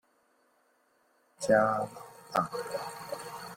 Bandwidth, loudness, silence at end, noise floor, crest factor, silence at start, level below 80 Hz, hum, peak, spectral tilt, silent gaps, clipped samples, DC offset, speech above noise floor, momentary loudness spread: 16.5 kHz; -31 LUFS; 0 s; -70 dBFS; 22 dB; 1.4 s; -70 dBFS; none; -12 dBFS; -4.5 dB/octave; none; under 0.1%; under 0.1%; 41 dB; 15 LU